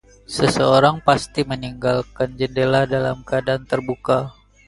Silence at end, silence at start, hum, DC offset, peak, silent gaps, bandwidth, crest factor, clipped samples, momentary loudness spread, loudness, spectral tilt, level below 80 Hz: 0.35 s; 0.3 s; none; under 0.1%; 0 dBFS; none; 11.5 kHz; 20 dB; under 0.1%; 9 LU; -19 LUFS; -5.5 dB/octave; -46 dBFS